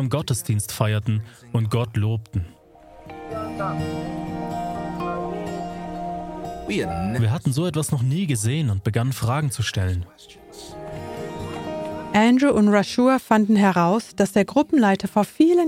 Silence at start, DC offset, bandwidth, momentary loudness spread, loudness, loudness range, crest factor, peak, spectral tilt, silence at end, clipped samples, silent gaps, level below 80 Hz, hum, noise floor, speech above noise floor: 0 s; under 0.1%; 16.5 kHz; 15 LU; -22 LUFS; 10 LU; 18 dB; -4 dBFS; -6 dB/octave; 0 s; under 0.1%; none; -48 dBFS; none; -47 dBFS; 26 dB